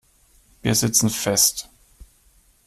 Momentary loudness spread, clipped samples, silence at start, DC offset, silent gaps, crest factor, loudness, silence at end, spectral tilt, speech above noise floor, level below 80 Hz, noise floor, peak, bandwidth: 10 LU; under 0.1%; 0.65 s; under 0.1%; none; 20 dB; -19 LUFS; 1.05 s; -3 dB/octave; 38 dB; -50 dBFS; -58 dBFS; -4 dBFS; 15.5 kHz